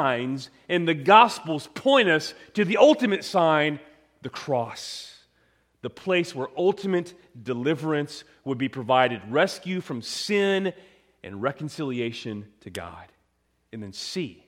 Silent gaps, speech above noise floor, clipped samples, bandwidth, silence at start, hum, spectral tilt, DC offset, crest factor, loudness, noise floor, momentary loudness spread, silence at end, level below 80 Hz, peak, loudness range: none; 46 dB; under 0.1%; 16 kHz; 0 s; none; -5 dB/octave; under 0.1%; 22 dB; -24 LUFS; -70 dBFS; 20 LU; 0.15 s; -68 dBFS; -2 dBFS; 9 LU